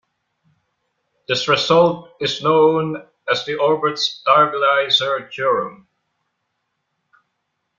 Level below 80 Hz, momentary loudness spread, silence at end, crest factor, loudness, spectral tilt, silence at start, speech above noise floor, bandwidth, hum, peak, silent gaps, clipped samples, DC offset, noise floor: -62 dBFS; 9 LU; 2.05 s; 18 dB; -17 LUFS; -4 dB/octave; 1.3 s; 56 dB; 7.4 kHz; none; -2 dBFS; none; under 0.1%; under 0.1%; -74 dBFS